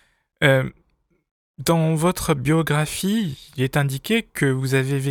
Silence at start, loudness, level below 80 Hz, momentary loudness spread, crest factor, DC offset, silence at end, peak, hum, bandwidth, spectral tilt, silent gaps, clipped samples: 0.4 s; -21 LUFS; -48 dBFS; 6 LU; 20 dB; under 0.1%; 0 s; -2 dBFS; none; 18.5 kHz; -5.5 dB/octave; 1.31-1.54 s; under 0.1%